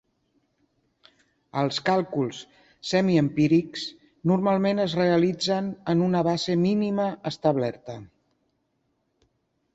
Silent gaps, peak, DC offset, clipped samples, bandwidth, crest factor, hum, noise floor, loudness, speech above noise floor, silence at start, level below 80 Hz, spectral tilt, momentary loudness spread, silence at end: none; -8 dBFS; under 0.1%; under 0.1%; 8 kHz; 18 dB; none; -73 dBFS; -24 LUFS; 50 dB; 1.55 s; -64 dBFS; -6.5 dB/octave; 12 LU; 1.7 s